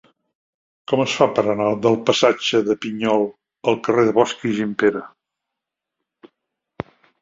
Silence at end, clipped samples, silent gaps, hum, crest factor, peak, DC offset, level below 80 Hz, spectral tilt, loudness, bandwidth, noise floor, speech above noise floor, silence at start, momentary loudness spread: 0.4 s; under 0.1%; none; none; 20 dB; -2 dBFS; under 0.1%; -60 dBFS; -5 dB/octave; -19 LUFS; 7.8 kHz; -83 dBFS; 65 dB; 0.9 s; 16 LU